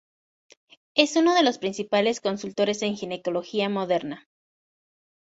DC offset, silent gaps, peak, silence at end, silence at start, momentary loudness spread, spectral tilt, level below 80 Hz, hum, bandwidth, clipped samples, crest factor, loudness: under 0.1%; none; -2 dBFS; 1.2 s; 0.95 s; 10 LU; -4 dB/octave; -70 dBFS; none; 8 kHz; under 0.1%; 24 dB; -24 LUFS